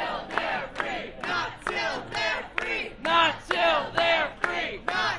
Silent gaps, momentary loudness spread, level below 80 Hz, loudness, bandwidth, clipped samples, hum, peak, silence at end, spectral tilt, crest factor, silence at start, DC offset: none; 8 LU; -52 dBFS; -26 LUFS; 11.5 kHz; under 0.1%; none; -8 dBFS; 0 s; -3 dB/octave; 20 dB; 0 s; under 0.1%